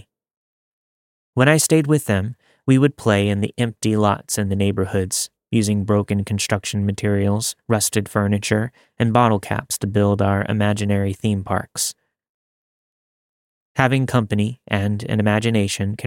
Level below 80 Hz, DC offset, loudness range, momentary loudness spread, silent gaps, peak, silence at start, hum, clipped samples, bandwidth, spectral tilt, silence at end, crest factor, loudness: -56 dBFS; under 0.1%; 5 LU; 7 LU; 12.29-13.75 s; -2 dBFS; 1.35 s; none; under 0.1%; 17 kHz; -5 dB/octave; 0 s; 18 dB; -20 LUFS